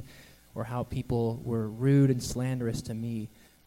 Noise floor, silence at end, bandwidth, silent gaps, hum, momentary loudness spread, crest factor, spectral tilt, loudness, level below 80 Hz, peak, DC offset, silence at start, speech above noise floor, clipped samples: -53 dBFS; 0.4 s; 16 kHz; none; none; 16 LU; 16 dB; -7 dB/octave; -30 LUFS; -50 dBFS; -14 dBFS; under 0.1%; 0 s; 24 dB; under 0.1%